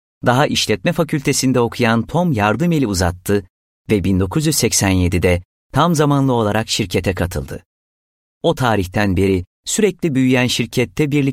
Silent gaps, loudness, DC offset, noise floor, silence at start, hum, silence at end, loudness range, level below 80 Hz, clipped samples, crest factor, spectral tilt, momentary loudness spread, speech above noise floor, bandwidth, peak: 3.50-3.85 s, 5.45-5.70 s, 7.65-8.41 s, 9.47-9.63 s; -17 LUFS; under 0.1%; under -90 dBFS; 0.25 s; none; 0 s; 3 LU; -38 dBFS; under 0.1%; 16 dB; -5 dB/octave; 6 LU; over 74 dB; 16.5 kHz; -2 dBFS